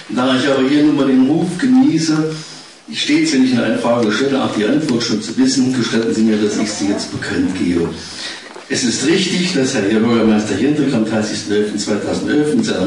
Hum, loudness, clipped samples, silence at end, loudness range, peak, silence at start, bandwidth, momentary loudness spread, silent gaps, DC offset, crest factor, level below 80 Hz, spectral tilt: none; -15 LUFS; under 0.1%; 0 s; 3 LU; -6 dBFS; 0 s; 11 kHz; 8 LU; none; 0.2%; 10 dB; -54 dBFS; -4.5 dB/octave